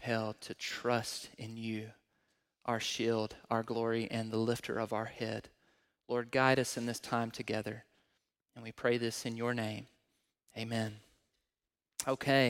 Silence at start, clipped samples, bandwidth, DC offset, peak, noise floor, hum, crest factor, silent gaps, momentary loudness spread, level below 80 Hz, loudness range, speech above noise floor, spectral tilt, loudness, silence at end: 0 s; under 0.1%; 16.5 kHz; under 0.1%; -14 dBFS; under -90 dBFS; none; 24 dB; none; 12 LU; -72 dBFS; 4 LU; over 55 dB; -4.5 dB/octave; -36 LUFS; 0 s